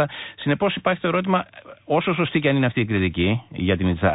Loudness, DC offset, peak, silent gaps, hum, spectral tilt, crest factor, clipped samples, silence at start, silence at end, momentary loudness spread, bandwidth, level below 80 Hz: -22 LUFS; under 0.1%; -8 dBFS; none; none; -11.5 dB/octave; 14 dB; under 0.1%; 0 s; 0 s; 5 LU; 4 kHz; -40 dBFS